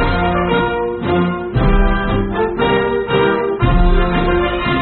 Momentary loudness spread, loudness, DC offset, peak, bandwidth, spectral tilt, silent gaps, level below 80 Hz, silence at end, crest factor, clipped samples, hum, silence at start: 3 LU; -16 LUFS; under 0.1%; -2 dBFS; 4.4 kHz; -5 dB/octave; none; -20 dBFS; 0 s; 12 dB; under 0.1%; none; 0 s